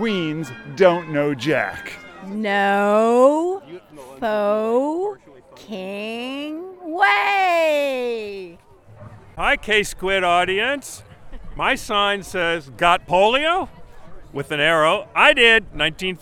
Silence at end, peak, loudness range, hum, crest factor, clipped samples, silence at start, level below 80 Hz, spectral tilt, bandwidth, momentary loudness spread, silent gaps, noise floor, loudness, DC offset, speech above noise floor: 0.05 s; 0 dBFS; 5 LU; none; 20 dB; under 0.1%; 0 s; -46 dBFS; -4 dB/octave; 18 kHz; 18 LU; none; -45 dBFS; -19 LUFS; under 0.1%; 26 dB